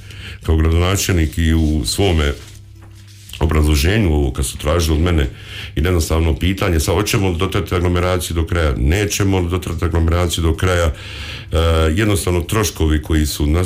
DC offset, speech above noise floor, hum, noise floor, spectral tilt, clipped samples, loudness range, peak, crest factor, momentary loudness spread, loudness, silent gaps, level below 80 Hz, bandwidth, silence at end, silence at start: under 0.1%; 23 dB; none; -38 dBFS; -5.5 dB/octave; under 0.1%; 1 LU; -6 dBFS; 10 dB; 6 LU; -17 LUFS; none; -22 dBFS; 16 kHz; 0 s; 0 s